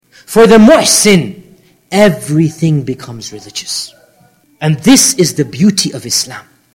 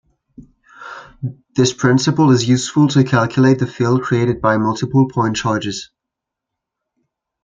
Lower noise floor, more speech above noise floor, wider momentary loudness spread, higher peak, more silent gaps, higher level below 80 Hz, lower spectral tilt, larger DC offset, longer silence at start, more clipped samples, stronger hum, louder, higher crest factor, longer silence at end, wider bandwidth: second, -49 dBFS vs -82 dBFS; second, 39 dB vs 67 dB; first, 18 LU vs 15 LU; about the same, 0 dBFS vs -2 dBFS; neither; first, -42 dBFS vs -52 dBFS; second, -4 dB/octave vs -6 dB/octave; neither; about the same, 0.3 s vs 0.4 s; first, 0.7% vs under 0.1%; neither; first, -9 LUFS vs -15 LUFS; second, 10 dB vs 16 dB; second, 0.35 s vs 1.6 s; first, 17 kHz vs 9.2 kHz